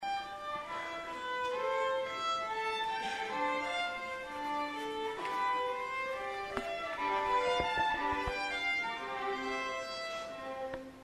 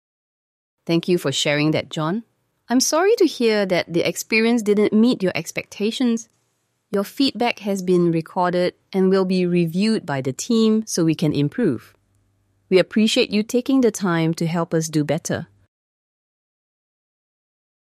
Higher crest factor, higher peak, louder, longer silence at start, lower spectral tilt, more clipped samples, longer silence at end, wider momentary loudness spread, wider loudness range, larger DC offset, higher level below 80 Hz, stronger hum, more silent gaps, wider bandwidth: about the same, 20 dB vs 18 dB; second, -16 dBFS vs -4 dBFS; second, -35 LUFS vs -20 LUFS; second, 0 s vs 0.85 s; second, -3 dB/octave vs -5 dB/octave; neither; second, 0 s vs 2.45 s; about the same, 8 LU vs 8 LU; about the same, 3 LU vs 4 LU; neither; about the same, -60 dBFS vs -64 dBFS; neither; neither; about the same, 14 kHz vs 15 kHz